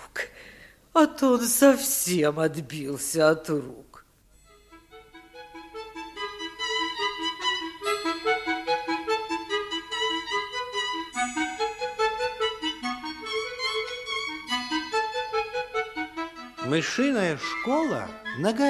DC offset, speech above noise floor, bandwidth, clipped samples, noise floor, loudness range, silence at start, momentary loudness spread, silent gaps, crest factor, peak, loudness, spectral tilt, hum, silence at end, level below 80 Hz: under 0.1%; 34 dB; 15 kHz; under 0.1%; -58 dBFS; 7 LU; 0 s; 12 LU; none; 22 dB; -6 dBFS; -27 LUFS; -3 dB/octave; none; 0 s; -60 dBFS